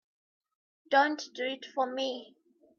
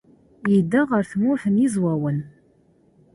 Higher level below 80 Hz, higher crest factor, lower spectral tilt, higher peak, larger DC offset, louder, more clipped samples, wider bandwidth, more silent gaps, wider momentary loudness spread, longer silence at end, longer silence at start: second, -88 dBFS vs -60 dBFS; first, 20 dB vs 14 dB; second, -1.5 dB/octave vs -8 dB/octave; second, -14 dBFS vs -8 dBFS; neither; second, -31 LUFS vs -21 LUFS; neither; second, 7.2 kHz vs 11.5 kHz; neither; about the same, 10 LU vs 10 LU; second, 0.55 s vs 0.85 s; first, 0.9 s vs 0.45 s